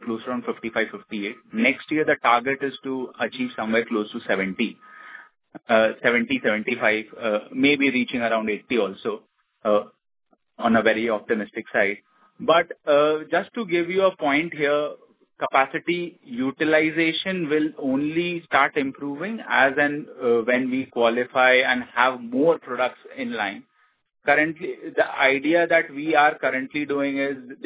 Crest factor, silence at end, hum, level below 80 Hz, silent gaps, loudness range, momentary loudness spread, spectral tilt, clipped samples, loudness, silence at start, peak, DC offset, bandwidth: 20 dB; 0 s; none; -66 dBFS; none; 3 LU; 10 LU; -8.5 dB/octave; under 0.1%; -22 LUFS; 0 s; -2 dBFS; under 0.1%; 4 kHz